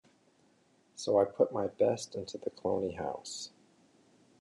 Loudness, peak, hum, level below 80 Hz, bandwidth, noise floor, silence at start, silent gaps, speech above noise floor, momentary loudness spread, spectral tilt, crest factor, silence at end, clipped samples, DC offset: -33 LUFS; -14 dBFS; none; -74 dBFS; 11 kHz; -68 dBFS; 0.95 s; none; 36 dB; 13 LU; -5 dB/octave; 20 dB; 0.95 s; under 0.1%; under 0.1%